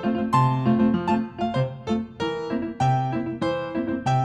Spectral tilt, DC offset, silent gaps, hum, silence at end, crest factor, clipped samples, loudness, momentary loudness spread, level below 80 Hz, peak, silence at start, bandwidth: -7.5 dB/octave; under 0.1%; none; none; 0 s; 16 dB; under 0.1%; -24 LUFS; 7 LU; -54 dBFS; -6 dBFS; 0 s; 9.2 kHz